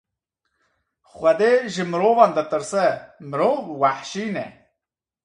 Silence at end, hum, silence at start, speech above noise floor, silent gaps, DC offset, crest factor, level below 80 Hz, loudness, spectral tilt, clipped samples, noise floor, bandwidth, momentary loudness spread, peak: 0.75 s; none; 1.15 s; 65 dB; none; under 0.1%; 22 dB; -66 dBFS; -21 LUFS; -5 dB/octave; under 0.1%; -86 dBFS; 11 kHz; 13 LU; 0 dBFS